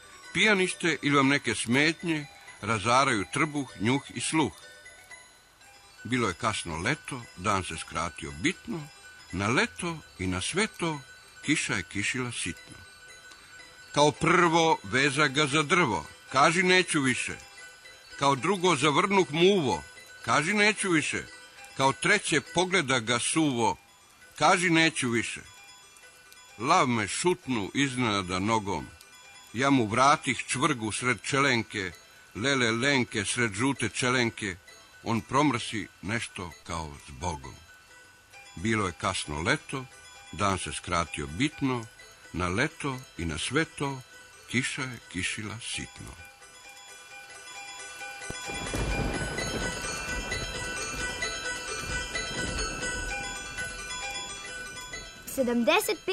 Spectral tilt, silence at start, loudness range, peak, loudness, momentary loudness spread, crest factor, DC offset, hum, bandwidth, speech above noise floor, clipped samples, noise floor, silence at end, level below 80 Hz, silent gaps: -3.5 dB/octave; 0 s; 8 LU; -10 dBFS; -27 LUFS; 21 LU; 20 dB; under 0.1%; none; 14 kHz; 28 dB; under 0.1%; -55 dBFS; 0 s; -50 dBFS; none